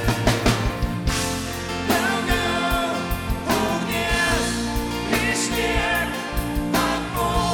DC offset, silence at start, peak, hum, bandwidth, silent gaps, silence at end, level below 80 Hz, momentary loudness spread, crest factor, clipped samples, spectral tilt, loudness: under 0.1%; 0 s; -6 dBFS; none; 19.5 kHz; none; 0 s; -32 dBFS; 6 LU; 16 dB; under 0.1%; -4 dB/octave; -22 LUFS